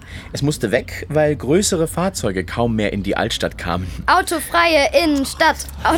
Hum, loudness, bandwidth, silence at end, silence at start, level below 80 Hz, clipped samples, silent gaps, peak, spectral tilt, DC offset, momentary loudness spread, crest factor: none; -18 LUFS; over 20 kHz; 0 s; 0 s; -36 dBFS; under 0.1%; none; -2 dBFS; -4.5 dB/octave; under 0.1%; 8 LU; 16 dB